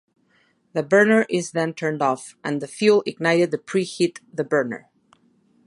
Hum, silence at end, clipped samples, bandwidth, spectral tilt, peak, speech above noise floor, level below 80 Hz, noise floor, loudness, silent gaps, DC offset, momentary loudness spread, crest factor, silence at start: none; 0.9 s; under 0.1%; 11.5 kHz; -5 dB/octave; -4 dBFS; 42 dB; -74 dBFS; -63 dBFS; -21 LUFS; none; under 0.1%; 11 LU; 18 dB; 0.75 s